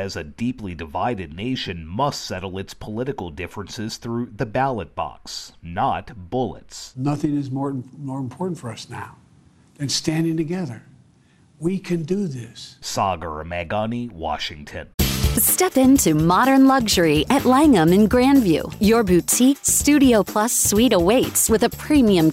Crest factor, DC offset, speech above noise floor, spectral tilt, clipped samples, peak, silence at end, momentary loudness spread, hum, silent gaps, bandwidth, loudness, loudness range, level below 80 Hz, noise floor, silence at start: 14 dB; under 0.1%; 35 dB; -4.5 dB/octave; under 0.1%; -6 dBFS; 0 s; 17 LU; none; 14.94-14.98 s; 16 kHz; -19 LUFS; 12 LU; -38 dBFS; -55 dBFS; 0 s